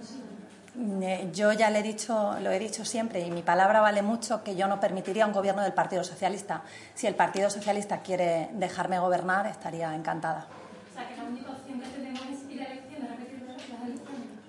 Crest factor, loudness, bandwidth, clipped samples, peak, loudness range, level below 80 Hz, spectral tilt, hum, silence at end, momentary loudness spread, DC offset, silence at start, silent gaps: 18 dB; -29 LUFS; 11.5 kHz; under 0.1%; -10 dBFS; 12 LU; -80 dBFS; -4.5 dB/octave; none; 0 s; 17 LU; under 0.1%; 0 s; none